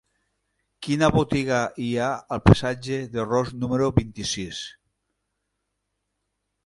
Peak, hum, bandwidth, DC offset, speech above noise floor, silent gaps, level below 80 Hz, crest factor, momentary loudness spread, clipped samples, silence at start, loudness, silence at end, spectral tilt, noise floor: 0 dBFS; 50 Hz at -50 dBFS; 11.5 kHz; under 0.1%; 56 dB; none; -42 dBFS; 24 dB; 11 LU; under 0.1%; 0.8 s; -23 LUFS; 1.95 s; -6 dB/octave; -78 dBFS